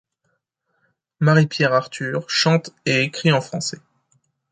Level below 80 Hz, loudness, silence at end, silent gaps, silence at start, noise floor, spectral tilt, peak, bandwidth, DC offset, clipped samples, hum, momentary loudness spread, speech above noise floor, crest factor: -64 dBFS; -19 LUFS; 0.75 s; none; 1.2 s; -72 dBFS; -5 dB/octave; -2 dBFS; 9.4 kHz; under 0.1%; under 0.1%; none; 10 LU; 53 dB; 20 dB